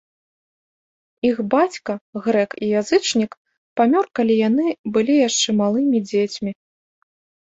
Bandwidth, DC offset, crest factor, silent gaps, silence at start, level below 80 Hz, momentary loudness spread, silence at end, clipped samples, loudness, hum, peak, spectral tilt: 8.2 kHz; under 0.1%; 18 dB; 2.01-2.13 s, 3.37-3.45 s, 3.58-3.76 s, 4.79-4.84 s; 1.25 s; -62 dBFS; 10 LU; 0.95 s; under 0.1%; -19 LUFS; none; -2 dBFS; -4 dB/octave